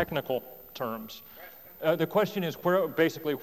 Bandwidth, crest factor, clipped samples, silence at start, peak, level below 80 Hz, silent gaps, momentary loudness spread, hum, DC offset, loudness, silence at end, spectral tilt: 20 kHz; 18 dB; under 0.1%; 0 s; -12 dBFS; -64 dBFS; none; 18 LU; none; under 0.1%; -29 LUFS; 0 s; -6 dB/octave